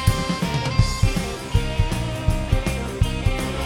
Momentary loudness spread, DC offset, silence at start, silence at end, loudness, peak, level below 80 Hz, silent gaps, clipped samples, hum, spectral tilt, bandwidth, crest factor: 3 LU; under 0.1%; 0 s; 0 s; -23 LUFS; -4 dBFS; -26 dBFS; none; under 0.1%; none; -5.5 dB/octave; 17 kHz; 18 dB